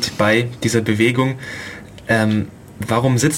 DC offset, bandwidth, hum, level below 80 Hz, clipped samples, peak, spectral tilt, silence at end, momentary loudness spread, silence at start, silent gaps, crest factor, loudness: under 0.1%; 16.5 kHz; none; -48 dBFS; under 0.1%; -2 dBFS; -5 dB/octave; 0 s; 15 LU; 0 s; none; 16 dB; -18 LUFS